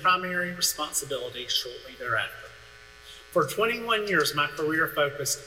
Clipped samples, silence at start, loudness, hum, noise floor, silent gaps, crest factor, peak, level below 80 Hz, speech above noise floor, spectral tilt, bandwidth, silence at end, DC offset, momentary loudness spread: under 0.1%; 0 s; -27 LUFS; none; -49 dBFS; none; 18 dB; -10 dBFS; -60 dBFS; 22 dB; -2 dB/octave; 16.5 kHz; 0 s; under 0.1%; 15 LU